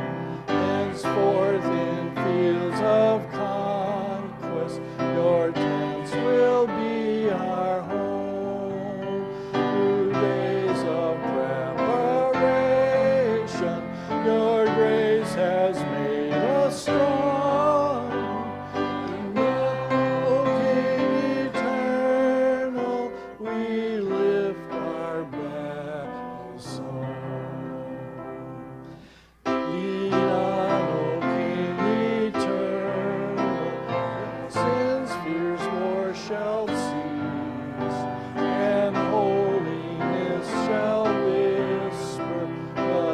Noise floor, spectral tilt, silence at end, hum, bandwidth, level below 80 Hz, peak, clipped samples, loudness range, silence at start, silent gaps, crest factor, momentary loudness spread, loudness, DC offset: -50 dBFS; -6.5 dB/octave; 0 s; none; 12 kHz; -58 dBFS; -8 dBFS; under 0.1%; 6 LU; 0 s; none; 16 dB; 11 LU; -25 LUFS; under 0.1%